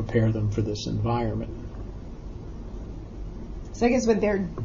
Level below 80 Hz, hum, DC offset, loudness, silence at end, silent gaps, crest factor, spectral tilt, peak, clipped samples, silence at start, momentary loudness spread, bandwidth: -38 dBFS; none; under 0.1%; -25 LUFS; 0 s; none; 18 dB; -7 dB/octave; -8 dBFS; under 0.1%; 0 s; 17 LU; 7.4 kHz